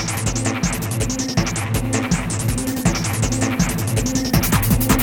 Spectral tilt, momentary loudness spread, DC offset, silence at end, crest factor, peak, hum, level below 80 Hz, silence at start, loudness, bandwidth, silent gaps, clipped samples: -4.5 dB/octave; 5 LU; under 0.1%; 0 s; 16 dB; -2 dBFS; none; -30 dBFS; 0 s; -20 LUFS; 19 kHz; none; under 0.1%